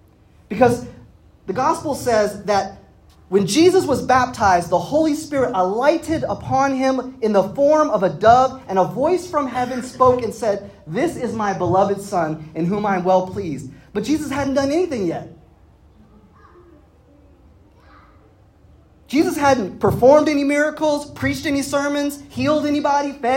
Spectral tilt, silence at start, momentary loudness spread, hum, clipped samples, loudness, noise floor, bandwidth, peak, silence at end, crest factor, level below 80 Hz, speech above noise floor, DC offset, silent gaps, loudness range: -5.5 dB/octave; 0.5 s; 10 LU; none; under 0.1%; -19 LUFS; -51 dBFS; 16.5 kHz; 0 dBFS; 0 s; 18 dB; -48 dBFS; 33 dB; under 0.1%; none; 7 LU